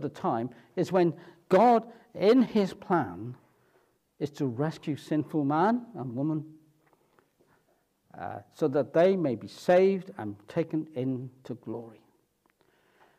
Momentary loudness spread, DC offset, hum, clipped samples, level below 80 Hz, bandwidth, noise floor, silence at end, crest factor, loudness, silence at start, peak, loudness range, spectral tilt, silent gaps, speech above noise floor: 17 LU; under 0.1%; none; under 0.1%; -76 dBFS; 13.5 kHz; -71 dBFS; 1.3 s; 18 dB; -28 LUFS; 0 s; -10 dBFS; 7 LU; -7.5 dB/octave; none; 43 dB